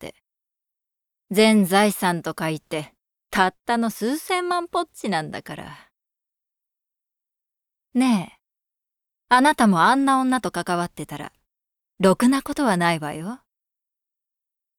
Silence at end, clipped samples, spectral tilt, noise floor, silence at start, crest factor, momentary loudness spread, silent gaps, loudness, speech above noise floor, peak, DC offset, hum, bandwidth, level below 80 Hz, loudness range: 1.45 s; under 0.1%; -5 dB/octave; -87 dBFS; 0 s; 20 dB; 18 LU; none; -21 LUFS; 66 dB; -4 dBFS; under 0.1%; none; 18 kHz; -60 dBFS; 9 LU